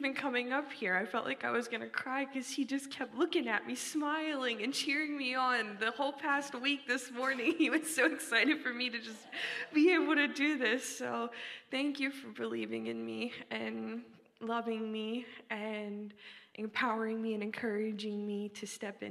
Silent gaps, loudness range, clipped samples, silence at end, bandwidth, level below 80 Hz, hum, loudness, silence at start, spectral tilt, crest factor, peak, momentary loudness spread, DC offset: none; 8 LU; under 0.1%; 0 s; 15 kHz; -88 dBFS; none; -35 LUFS; 0 s; -3 dB/octave; 20 dB; -16 dBFS; 12 LU; under 0.1%